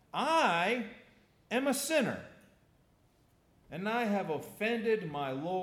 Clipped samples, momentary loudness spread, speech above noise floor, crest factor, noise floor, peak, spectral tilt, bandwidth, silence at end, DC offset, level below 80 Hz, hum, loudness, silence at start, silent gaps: under 0.1%; 10 LU; 35 dB; 18 dB; -68 dBFS; -16 dBFS; -4 dB/octave; 18.5 kHz; 0 s; under 0.1%; -74 dBFS; none; -32 LUFS; 0.15 s; none